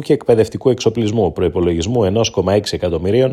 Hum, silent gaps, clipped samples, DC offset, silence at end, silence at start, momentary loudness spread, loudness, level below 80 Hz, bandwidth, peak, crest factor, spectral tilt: none; none; under 0.1%; under 0.1%; 0 s; 0 s; 3 LU; -16 LUFS; -38 dBFS; 13 kHz; 0 dBFS; 14 dB; -6 dB/octave